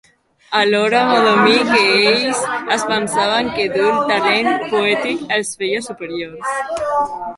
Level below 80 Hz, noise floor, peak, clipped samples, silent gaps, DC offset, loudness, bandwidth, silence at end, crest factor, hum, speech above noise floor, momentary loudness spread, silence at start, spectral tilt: -56 dBFS; -44 dBFS; 0 dBFS; under 0.1%; none; under 0.1%; -16 LUFS; 11.5 kHz; 0 s; 16 dB; none; 28 dB; 10 LU; 0.5 s; -3 dB/octave